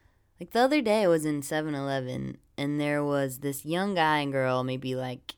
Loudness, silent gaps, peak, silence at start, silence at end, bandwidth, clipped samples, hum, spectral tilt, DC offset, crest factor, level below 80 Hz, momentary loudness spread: -28 LUFS; none; -10 dBFS; 0.4 s; 0.05 s; over 20 kHz; under 0.1%; none; -5.5 dB/octave; under 0.1%; 18 dB; -64 dBFS; 10 LU